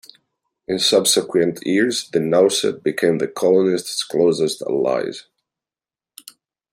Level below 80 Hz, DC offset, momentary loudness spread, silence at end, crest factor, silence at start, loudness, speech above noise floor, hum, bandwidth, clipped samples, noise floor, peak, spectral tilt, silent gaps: -66 dBFS; under 0.1%; 7 LU; 1.5 s; 18 dB; 0.7 s; -18 LUFS; over 72 dB; none; 16 kHz; under 0.1%; under -90 dBFS; -2 dBFS; -3.5 dB/octave; none